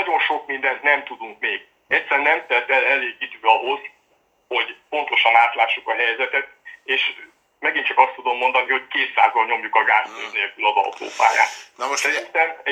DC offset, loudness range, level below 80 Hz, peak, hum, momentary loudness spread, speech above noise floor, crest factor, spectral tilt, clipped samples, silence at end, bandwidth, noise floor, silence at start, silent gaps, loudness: under 0.1%; 1 LU; -76 dBFS; 0 dBFS; none; 9 LU; 43 dB; 20 dB; 0 dB/octave; under 0.1%; 0 s; 14.5 kHz; -63 dBFS; 0 s; none; -19 LUFS